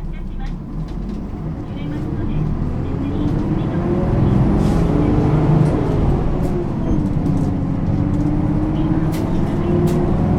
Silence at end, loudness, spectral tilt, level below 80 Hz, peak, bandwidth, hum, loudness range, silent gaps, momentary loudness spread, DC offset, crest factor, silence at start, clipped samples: 0 s; -19 LUFS; -9.5 dB/octave; -24 dBFS; -2 dBFS; 12 kHz; none; 6 LU; none; 11 LU; under 0.1%; 14 dB; 0 s; under 0.1%